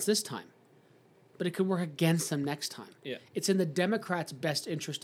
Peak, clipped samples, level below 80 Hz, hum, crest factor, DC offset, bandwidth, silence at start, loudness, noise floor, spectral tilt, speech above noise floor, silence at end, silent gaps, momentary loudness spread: -14 dBFS; under 0.1%; -88 dBFS; none; 18 dB; under 0.1%; 17 kHz; 0 s; -32 LUFS; -62 dBFS; -4.5 dB/octave; 30 dB; 0.05 s; none; 12 LU